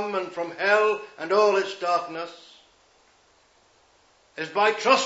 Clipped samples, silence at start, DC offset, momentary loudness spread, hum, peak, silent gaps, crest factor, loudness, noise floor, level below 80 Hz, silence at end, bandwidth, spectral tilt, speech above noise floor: under 0.1%; 0 s; under 0.1%; 15 LU; none; -4 dBFS; none; 20 dB; -24 LUFS; -61 dBFS; -78 dBFS; 0 s; 8 kHz; -2.5 dB/octave; 37 dB